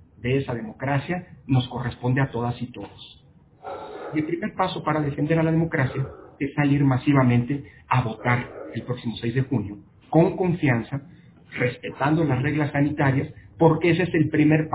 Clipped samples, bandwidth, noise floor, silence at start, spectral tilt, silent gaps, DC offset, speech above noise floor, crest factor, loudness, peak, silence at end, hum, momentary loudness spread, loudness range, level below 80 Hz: under 0.1%; 4 kHz; -43 dBFS; 0.2 s; -11.5 dB/octave; none; under 0.1%; 20 dB; 20 dB; -23 LUFS; -2 dBFS; 0 s; none; 15 LU; 5 LU; -50 dBFS